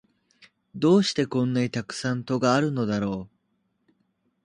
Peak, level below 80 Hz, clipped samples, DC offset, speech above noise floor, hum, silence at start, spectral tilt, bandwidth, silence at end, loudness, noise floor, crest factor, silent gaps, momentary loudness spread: -8 dBFS; -60 dBFS; under 0.1%; under 0.1%; 49 dB; none; 0.75 s; -6 dB/octave; 11 kHz; 1.2 s; -25 LUFS; -73 dBFS; 18 dB; none; 9 LU